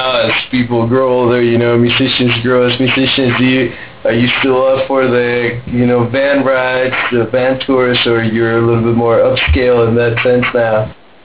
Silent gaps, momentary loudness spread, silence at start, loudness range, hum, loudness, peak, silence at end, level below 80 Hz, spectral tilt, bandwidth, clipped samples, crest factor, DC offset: none; 4 LU; 0 s; 1 LU; none; -11 LUFS; -2 dBFS; 0.3 s; -30 dBFS; -10 dB/octave; 4 kHz; under 0.1%; 10 dB; 0.9%